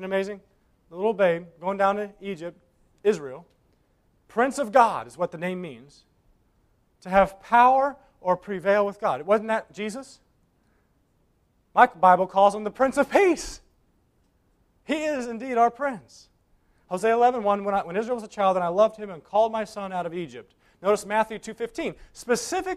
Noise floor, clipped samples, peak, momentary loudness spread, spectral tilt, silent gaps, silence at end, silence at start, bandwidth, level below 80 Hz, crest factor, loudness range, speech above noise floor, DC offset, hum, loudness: -66 dBFS; under 0.1%; -2 dBFS; 16 LU; -5 dB/octave; none; 0 s; 0 s; 14.5 kHz; -58 dBFS; 24 dB; 6 LU; 43 dB; under 0.1%; none; -24 LUFS